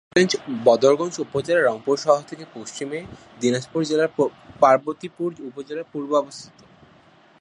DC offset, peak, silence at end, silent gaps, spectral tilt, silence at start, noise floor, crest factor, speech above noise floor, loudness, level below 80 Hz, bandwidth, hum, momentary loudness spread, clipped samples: under 0.1%; -2 dBFS; 0.95 s; none; -4.5 dB/octave; 0.15 s; -53 dBFS; 20 dB; 31 dB; -22 LUFS; -64 dBFS; 11 kHz; none; 17 LU; under 0.1%